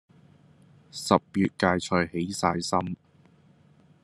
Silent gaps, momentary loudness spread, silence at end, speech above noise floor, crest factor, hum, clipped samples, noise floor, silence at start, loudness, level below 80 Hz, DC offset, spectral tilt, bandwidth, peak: none; 13 LU; 1.1 s; 33 dB; 26 dB; none; under 0.1%; -59 dBFS; 0.95 s; -26 LUFS; -64 dBFS; under 0.1%; -5 dB/octave; 13 kHz; -4 dBFS